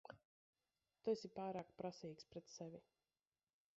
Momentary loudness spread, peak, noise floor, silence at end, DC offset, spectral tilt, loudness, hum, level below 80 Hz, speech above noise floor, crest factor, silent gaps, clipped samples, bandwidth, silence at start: 17 LU; -30 dBFS; under -90 dBFS; 0.95 s; under 0.1%; -5.5 dB/octave; -50 LUFS; none; -86 dBFS; over 41 dB; 22 dB; 0.25-0.53 s; under 0.1%; 7.6 kHz; 0.05 s